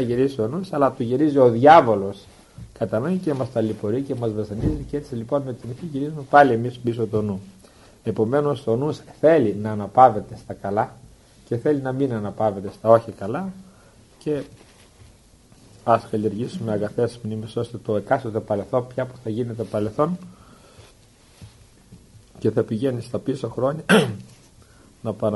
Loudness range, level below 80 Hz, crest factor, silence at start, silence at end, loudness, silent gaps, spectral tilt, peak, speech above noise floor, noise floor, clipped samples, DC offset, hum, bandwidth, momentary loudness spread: 9 LU; -50 dBFS; 22 dB; 0 s; 0 s; -22 LUFS; none; -7 dB/octave; 0 dBFS; 31 dB; -52 dBFS; under 0.1%; under 0.1%; none; 11.5 kHz; 14 LU